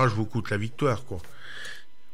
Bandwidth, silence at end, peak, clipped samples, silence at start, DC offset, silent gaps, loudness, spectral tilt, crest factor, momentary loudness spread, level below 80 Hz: 15 kHz; 0.35 s; -10 dBFS; under 0.1%; 0 s; 2%; none; -30 LUFS; -6.5 dB/octave; 18 dB; 15 LU; -56 dBFS